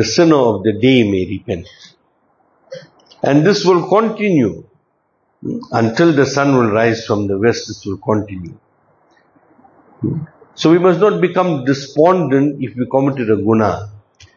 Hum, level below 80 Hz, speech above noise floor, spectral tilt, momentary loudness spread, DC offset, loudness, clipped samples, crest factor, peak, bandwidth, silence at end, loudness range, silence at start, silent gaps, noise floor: none; -52 dBFS; 49 dB; -6 dB/octave; 15 LU; under 0.1%; -15 LUFS; under 0.1%; 16 dB; 0 dBFS; 7.4 kHz; 0.4 s; 5 LU; 0 s; none; -63 dBFS